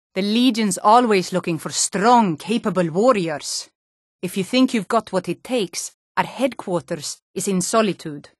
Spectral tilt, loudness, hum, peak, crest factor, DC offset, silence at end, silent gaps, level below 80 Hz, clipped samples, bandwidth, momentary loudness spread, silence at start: -4 dB/octave; -20 LUFS; none; -2 dBFS; 18 dB; under 0.1%; 0.2 s; 3.75-4.19 s, 5.94-6.15 s, 7.22-7.34 s; -66 dBFS; under 0.1%; 12.5 kHz; 13 LU; 0.15 s